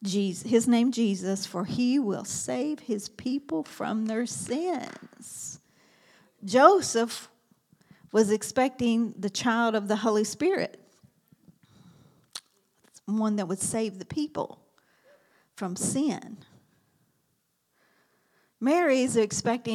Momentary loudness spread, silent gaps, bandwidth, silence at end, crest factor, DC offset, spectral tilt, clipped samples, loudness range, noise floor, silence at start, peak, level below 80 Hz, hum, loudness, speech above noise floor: 15 LU; none; 14.5 kHz; 0 s; 26 dB; under 0.1%; -4.5 dB/octave; under 0.1%; 9 LU; -74 dBFS; 0 s; -2 dBFS; -72 dBFS; none; -27 LUFS; 48 dB